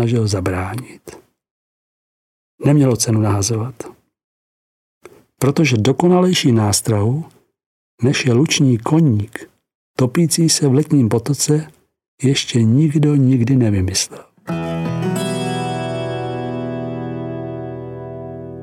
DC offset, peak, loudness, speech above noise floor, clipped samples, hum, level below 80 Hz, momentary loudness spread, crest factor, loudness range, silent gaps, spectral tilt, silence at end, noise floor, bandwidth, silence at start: under 0.1%; 0 dBFS; -17 LUFS; over 75 dB; under 0.1%; none; -52 dBFS; 16 LU; 16 dB; 7 LU; 1.51-2.58 s, 4.24-5.01 s, 7.66-7.98 s, 9.75-9.94 s, 12.08-12.18 s; -5.5 dB/octave; 0 s; under -90 dBFS; 16 kHz; 0 s